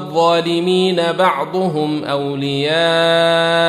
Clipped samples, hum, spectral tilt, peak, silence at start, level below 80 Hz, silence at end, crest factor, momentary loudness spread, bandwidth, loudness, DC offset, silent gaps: under 0.1%; none; -5 dB/octave; -2 dBFS; 0 s; -60 dBFS; 0 s; 14 dB; 7 LU; 14 kHz; -15 LUFS; under 0.1%; none